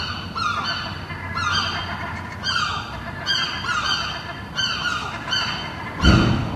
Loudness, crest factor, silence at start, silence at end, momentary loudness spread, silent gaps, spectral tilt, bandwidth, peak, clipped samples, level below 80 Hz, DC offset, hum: -23 LUFS; 22 dB; 0 s; 0 s; 11 LU; none; -4 dB/octave; 13 kHz; -2 dBFS; under 0.1%; -34 dBFS; under 0.1%; none